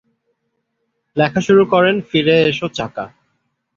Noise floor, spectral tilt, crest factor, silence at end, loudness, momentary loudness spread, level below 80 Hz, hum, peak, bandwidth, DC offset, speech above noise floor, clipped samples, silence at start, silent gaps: -71 dBFS; -6 dB/octave; 16 dB; 0.7 s; -15 LUFS; 14 LU; -54 dBFS; none; -2 dBFS; 7.4 kHz; under 0.1%; 56 dB; under 0.1%; 1.15 s; none